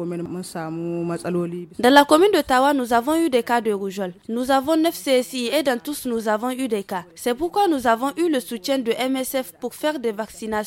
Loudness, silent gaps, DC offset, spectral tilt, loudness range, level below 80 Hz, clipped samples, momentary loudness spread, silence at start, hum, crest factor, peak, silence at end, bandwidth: -21 LUFS; none; under 0.1%; -4.5 dB/octave; 4 LU; -56 dBFS; under 0.1%; 12 LU; 0 s; none; 20 dB; 0 dBFS; 0 s; 17 kHz